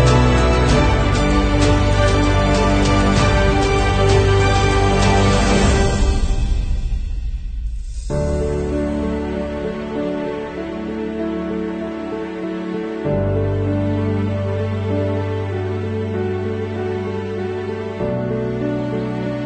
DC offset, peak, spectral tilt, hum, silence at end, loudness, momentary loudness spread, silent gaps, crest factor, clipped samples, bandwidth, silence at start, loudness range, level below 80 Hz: under 0.1%; -2 dBFS; -6 dB/octave; none; 0 s; -19 LUFS; 11 LU; none; 16 dB; under 0.1%; 9.4 kHz; 0 s; 8 LU; -24 dBFS